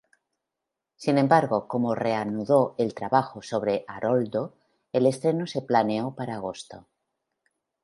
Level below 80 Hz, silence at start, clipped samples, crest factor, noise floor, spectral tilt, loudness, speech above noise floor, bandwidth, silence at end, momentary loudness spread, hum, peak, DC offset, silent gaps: -68 dBFS; 1 s; under 0.1%; 22 dB; -86 dBFS; -6.5 dB/octave; -25 LUFS; 61 dB; 11.5 kHz; 1.05 s; 11 LU; none; -4 dBFS; under 0.1%; none